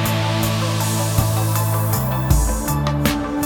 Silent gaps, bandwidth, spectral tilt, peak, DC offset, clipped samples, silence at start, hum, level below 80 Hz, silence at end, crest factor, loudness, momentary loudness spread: none; over 20 kHz; -5 dB/octave; -2 dBFS; under 0.1%; under 0.1%; 0 s; none; -26 dBFS; 0 s; 16 dB; -19 LUFS; 2 LU